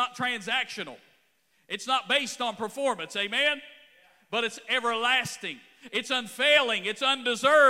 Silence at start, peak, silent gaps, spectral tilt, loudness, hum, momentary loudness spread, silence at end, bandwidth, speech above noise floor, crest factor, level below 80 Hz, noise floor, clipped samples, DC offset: 0 s; -6 dBFS; none; -1.5 dB/octave; -26 LUFS; none; 13 LU; 0 s; 16 kHz; 42 dB; 20 dB; -80 dBFS; -69 dBFS; under 0.1%; under 0.1%